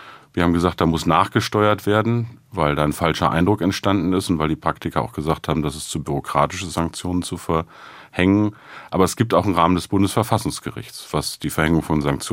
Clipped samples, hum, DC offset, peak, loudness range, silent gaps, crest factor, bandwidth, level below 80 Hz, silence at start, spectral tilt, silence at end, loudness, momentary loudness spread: under 0.1%; none; under 0.1%; -2 dBFS; 4 LU; none; 18 dB; 16 kHz; -44 dBFS; 0 s; -5.5 dB/octave; 0 s; -20 LUFS; 8 LU